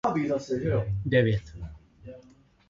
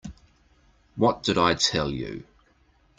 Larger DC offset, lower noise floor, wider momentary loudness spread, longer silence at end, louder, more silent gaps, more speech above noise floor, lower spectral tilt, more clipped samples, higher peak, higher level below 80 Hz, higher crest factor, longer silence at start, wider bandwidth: neither; second, -57 dBFS vs -62 dBFS; about the same, 23 LU vs 21 LU; second, 0.5 s vs 0.75 s; second, -27 LUFS vs -24 LUFS; neither; second, 31 dB vs 38 dB; first, -7.5 dB/octave vs -4 dB/octave; neither; second, -10 dBFS vs -6 dBFS; about the same, -46 dBFS vs -50 dBFS; about the same, 18 dB vs 22 dB; about the same, 0.05 s vs 0.05 s; second, 7.6 kHz vs 9.6 kHz